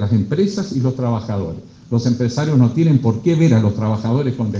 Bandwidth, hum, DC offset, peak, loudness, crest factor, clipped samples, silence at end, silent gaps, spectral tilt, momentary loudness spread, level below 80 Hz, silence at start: 7.6 kHz; none; under 0.1%; -2 dBFS; -17 LUFS; 14 dB; under 0.1%; 0 s; none; -8 dB/octave; 8 LU; -52 dBFS; 0 s